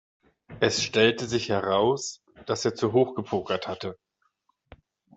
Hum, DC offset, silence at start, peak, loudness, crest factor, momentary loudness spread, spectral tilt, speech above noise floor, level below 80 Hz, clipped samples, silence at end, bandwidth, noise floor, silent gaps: none; under 0.1%; 0.5 s; -6 dBFS; -26 LUFS; 22 dB; 13 LU; -4 dB/octave; 47 dB; -62 dBFS; under 0.1%; 1.2 s; 8.2 kHz; -72 dBFS; none